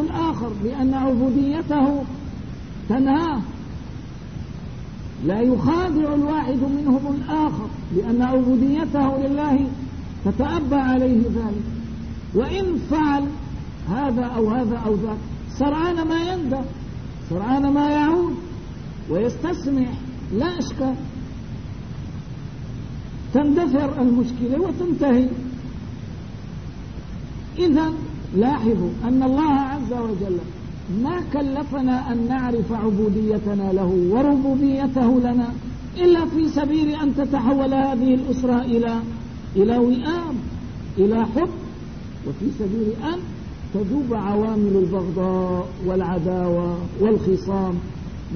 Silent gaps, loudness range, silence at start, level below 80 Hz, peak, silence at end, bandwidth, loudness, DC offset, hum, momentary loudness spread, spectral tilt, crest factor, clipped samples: none; 5 LU; 0 s; -38 dBFS; -6 dBFS; 0 s; 6.6 kHz; -21 LUFS; 0.6%; none; 15 LU; -8 dB/octave; 16 dB; under 0.1%